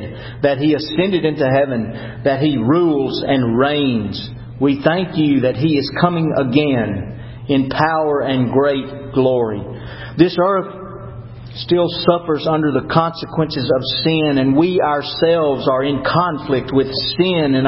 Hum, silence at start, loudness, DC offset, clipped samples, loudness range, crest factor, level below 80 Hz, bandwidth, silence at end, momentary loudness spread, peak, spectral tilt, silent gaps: none; 0 s; -17 LUFS; under 0.1%; under 0.1%; 2 LU; 16 dB; -44 dBFS; 5.8 kHz; 0 s; 12 LU; 0 dBFS; -10.5 dB/octave; none